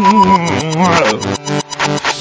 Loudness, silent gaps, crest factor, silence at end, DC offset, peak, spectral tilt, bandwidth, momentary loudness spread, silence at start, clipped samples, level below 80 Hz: -13 LUFS; none; 12 dB; 0 s; under 0.1%; 0 dBFS; -4.5 dB/octave; 8 kHz; 8 LU; 0 s; under 0.1%; -42 dBFS